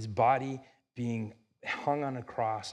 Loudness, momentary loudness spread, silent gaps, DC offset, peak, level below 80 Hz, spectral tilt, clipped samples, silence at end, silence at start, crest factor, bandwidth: -33 LUFS; 16 LU; none; under 0.1%; -14 dBFS; -74 dBFS; -6 dB/octave; under 0.1%; 0 s; 0 s; 20 dB; 10.5 kHz